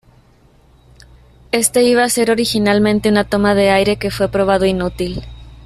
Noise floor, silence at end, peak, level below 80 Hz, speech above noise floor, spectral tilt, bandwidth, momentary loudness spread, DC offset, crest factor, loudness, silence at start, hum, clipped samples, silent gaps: -50 dBFS; 0.1 s; 0 dBFS; -38 dBFS; 35 dB; -4 dB/octave; 14.5 kHz; 8 LU; under 0.1%; 16 dB; -15 LUFS; 1.55 s; none; under 0.1%; none